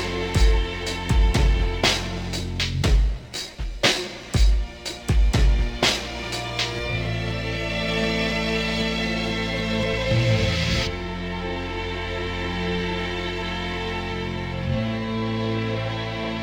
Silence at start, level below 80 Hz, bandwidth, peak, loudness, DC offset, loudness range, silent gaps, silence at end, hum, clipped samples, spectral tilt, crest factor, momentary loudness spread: 0 s; -26 dBFS; 16.5 kHz; -4 dBFS; -24 LUFS; under 0.1%; 4 LU; none; 0 s; none; under 0.1%; -4.5 dB/octave; 18 dB; 8 LU